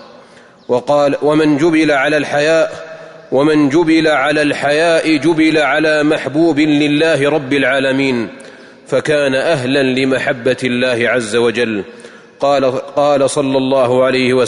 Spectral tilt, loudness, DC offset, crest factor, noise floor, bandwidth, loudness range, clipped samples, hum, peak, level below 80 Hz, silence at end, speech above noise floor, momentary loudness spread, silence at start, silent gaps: -5 dB/octave; -13 LUFS; under 0.1%; 10 dB; -42 dBFS; 11 kHz; 3 LU; under 0.1%; none; -2 dBFS; -52 dBFS; 0 s; 29 dB; 7 LU; 0 s; none